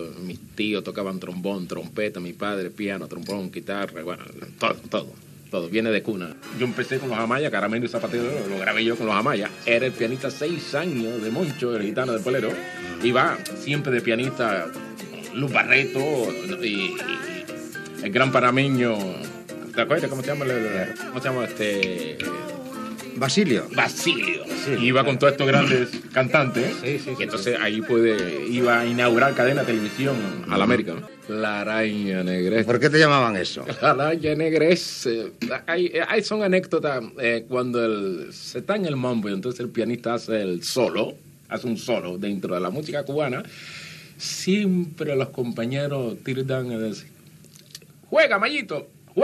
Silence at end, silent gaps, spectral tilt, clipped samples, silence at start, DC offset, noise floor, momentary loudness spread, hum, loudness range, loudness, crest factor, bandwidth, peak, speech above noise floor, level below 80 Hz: 0 s; none; -5 dB/octave; under 0.1%; 0 s; under 0.1%; -49 dBFS; 13 LU; none; 7 LU; -23 LUFS; 22 dB; 13.5 kHz; -2 dBFS; 25 dB; -66 dBFS